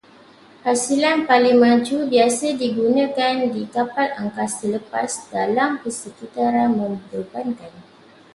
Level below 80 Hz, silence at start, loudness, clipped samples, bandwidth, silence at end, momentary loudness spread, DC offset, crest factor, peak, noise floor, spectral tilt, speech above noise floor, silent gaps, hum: -64 dBFS; 0.65 s; -20 LUFS; under 0.1%; 11.5 kHz; 0.55 s; 13 LU; under 0.1%; 18 dB; -2 dBFS; -48 dBFS; -4 dB/octave; 29 dB; none; none